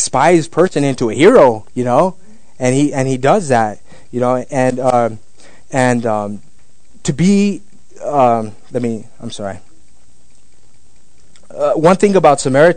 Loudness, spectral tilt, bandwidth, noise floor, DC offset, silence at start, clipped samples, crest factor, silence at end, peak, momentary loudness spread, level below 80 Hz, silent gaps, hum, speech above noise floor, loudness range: -14 LUFS; -5.5 dB/octave; 10.5 kHz; -52 dBFS; 3%; 0 s; 0.4%; 14 dB; 0 s; 0 dBFS; 16 LU; -48 dBFS; none; none; 40 dB; 7 LU